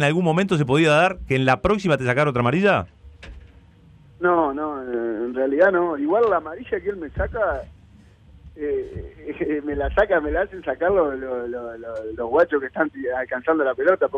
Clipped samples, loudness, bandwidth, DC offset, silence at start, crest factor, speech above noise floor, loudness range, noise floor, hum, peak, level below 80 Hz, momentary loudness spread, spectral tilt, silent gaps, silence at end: under 0.1%; -21 LUFS; 11 kHz; under 0.1%; 0 s; 16 dB; 29 dB; 5 LU; -50 dBFS; none; -6 dBFS; -42 dBFS; 11 LU; -6.5 dB/octave; none; 0 s